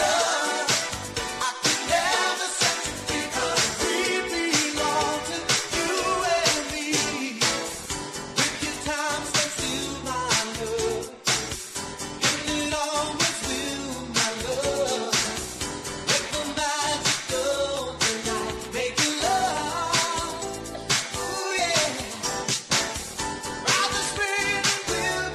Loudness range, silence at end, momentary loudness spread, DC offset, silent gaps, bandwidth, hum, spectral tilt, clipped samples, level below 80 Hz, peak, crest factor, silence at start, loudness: 2 LU; 0 s; 8 LU; under 0.1%; none; 13.5 kHz; none; -1.5 dB/octave; under 0.1%; -48 dBFS; -8 dBFS; 18 dB; 0 s; -25 LUFS